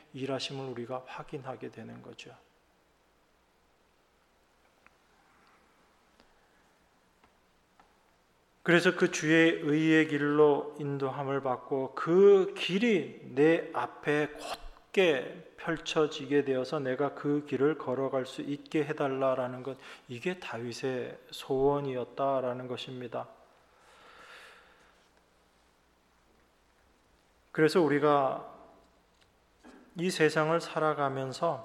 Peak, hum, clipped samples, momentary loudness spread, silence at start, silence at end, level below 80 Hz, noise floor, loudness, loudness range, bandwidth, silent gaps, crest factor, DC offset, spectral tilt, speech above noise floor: -10 dBFS; none; under 0.1%; 17 LU; 0.15 s; 0 s; -66 dBFS; -68 dBFS; -30 LUFS; 14 LU; 13 kHz; none; 22 dB; under 0.1%; -5.5 dB/octave; 39 dB